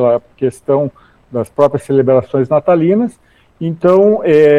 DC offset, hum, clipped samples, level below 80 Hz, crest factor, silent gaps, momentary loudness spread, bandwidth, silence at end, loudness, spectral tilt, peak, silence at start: under 0.1%; none; under 0.1%; -52 dBFS; 12 dB; none; 12 LU; 12 kHz; 0 s; -13 LUFS; -8.5 dB/octave; 0 dBFS; 0 s